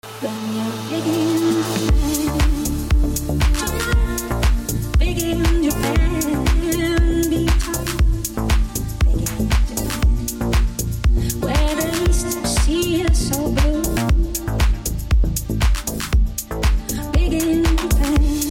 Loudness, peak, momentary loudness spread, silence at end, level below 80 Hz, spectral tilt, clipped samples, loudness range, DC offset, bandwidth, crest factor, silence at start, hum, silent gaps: -20 LUFS; -8 dBFS; 4 LU; 0 s; -20 dBFS; -5 dB/octave; under 0.1%; 1 LU; under 0.1%; 17 kHz; 10 dB; 0.05 s; none; none